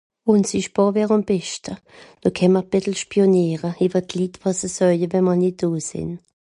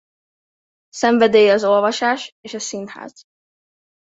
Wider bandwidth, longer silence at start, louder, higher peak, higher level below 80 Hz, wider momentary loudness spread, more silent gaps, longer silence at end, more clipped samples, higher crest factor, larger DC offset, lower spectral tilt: first, 11 kHz vs 8 kHz; second, 0.25 s vs 0.95 s; second, -20 LUFS vs -16 LUFS; about the same, -4 dBFS vs -2 dBFS; first, -54 dBFS vs -66 dBFS; second, 11 LU vs 20 LU; second, none vs 2.32-2.43 s; second, 0.25 s vs 0.95 s; neither; about the same, 16 dB vs 18 dB; neither; first, -6 dB/octave vs -3.5 dB/octave